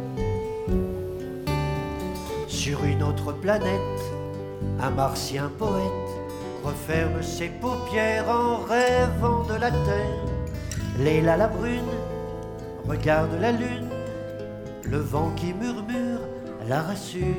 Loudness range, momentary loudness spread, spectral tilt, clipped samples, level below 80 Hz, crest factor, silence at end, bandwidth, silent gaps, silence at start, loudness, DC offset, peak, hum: 4 LU; 11 LU; -6 dB/octave; under 0.1%; -38 dBFS; 18 dB; 0 s; 18.5 kHz; none; 0 s; -27 LUFS; under 0.1%; -8 dBFS; none